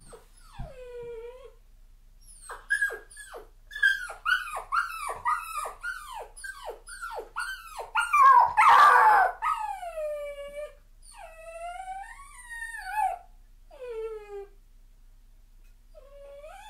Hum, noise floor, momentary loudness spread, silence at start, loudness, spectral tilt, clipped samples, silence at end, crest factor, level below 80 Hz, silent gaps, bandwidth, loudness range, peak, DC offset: none; -53 dBFS; 26 LU; 0.1 s; -24 LUFS; -1 dB/octave; under 0.1%; 0 s; 20 dB; -52 dBFS; none; 16 kHz; 16 LU; -8 dBFS; under 0.1%